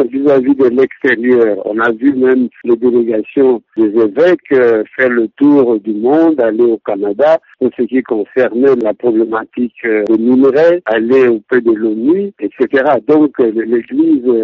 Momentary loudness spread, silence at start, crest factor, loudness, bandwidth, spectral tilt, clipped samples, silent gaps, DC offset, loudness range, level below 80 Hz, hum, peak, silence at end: 5 LU; 0 s; 10 dB; -12 LUFS; 5.8 kHz; -5 dB/octave; under 0.1%; none; under 0.1%; 2 LU; -58 dBFS; none; 0 dBFS; 0 s